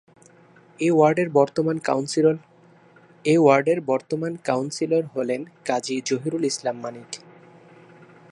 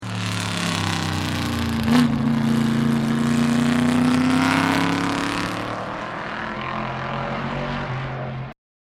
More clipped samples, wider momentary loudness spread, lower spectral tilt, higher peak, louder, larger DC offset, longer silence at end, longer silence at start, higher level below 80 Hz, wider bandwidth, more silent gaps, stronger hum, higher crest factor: neither; about the same, 11 LU vs 10 LU; about the same, -5.5 dB/octave vs -5.5 dB/octave; about the same, -4 dBFS vs -2 dBFS; about the same, -22 LUFS vs -22 LUFS; neither; first, 1.15 s vs 0.45 s; first, 0.8 s vs 0 s; second, -72 dBFS vs -46 dBFS; second, 11.5 kHz vs 15.5 kHz; neither; first, 60 Hz at -55 dBFS vs none; about the same, 20 dB vs 20 dB